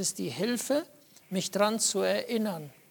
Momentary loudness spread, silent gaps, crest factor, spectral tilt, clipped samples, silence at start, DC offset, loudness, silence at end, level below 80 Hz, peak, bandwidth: 10 LU; none; 20 dB; -3.5 dB/octave; under 0.1%; 0 s; under 0.1%; -29 LUFS; 0.2 s; -78 dBFS; -10 dBFS; 19 kHz